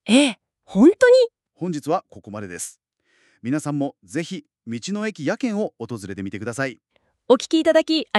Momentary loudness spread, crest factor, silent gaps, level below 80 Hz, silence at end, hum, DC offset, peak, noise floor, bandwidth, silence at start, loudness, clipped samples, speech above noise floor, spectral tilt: 18 LU; 18 dB; none; -64 dBFS; 0 s; none; under 0.1%; -4 dBFS; -63 dBFS; 12.5 kHz; 0.05 s; -21 LUFS; under 0.1%; 43 dB; -5 dB/octave